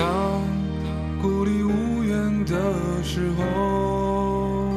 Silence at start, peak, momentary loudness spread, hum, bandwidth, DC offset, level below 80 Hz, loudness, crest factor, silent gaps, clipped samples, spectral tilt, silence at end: 0 s; -8 dBFS; 4 LU; none; 13.5 kHz; under 0.1%; -36 dBFS; -24 LUFS; 14 dB; none; under 0.1%; -7 dB/octave; 0 s